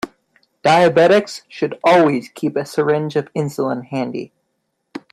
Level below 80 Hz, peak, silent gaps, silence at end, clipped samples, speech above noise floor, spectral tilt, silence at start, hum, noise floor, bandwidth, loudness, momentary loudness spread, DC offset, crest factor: -62 dBFS; 0 dBFS; none; 0.15 s; under 0.1%; 55 dB; -6 dB/octave; 0.05 s; none; -71 dBFS; 13.5 kHz; -17 LUFS; 18 LU; under 0.1%; 18 dB